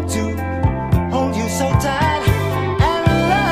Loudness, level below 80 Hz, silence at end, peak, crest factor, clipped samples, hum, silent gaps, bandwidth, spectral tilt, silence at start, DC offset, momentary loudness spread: -18 LUFS; -28 dBFS; 0 s; 0 dBFS; 16 dB; under 0.1%; none; none; 15.5 kHz; -6 dB/octave; 0 s; under 0.1%; 5 LU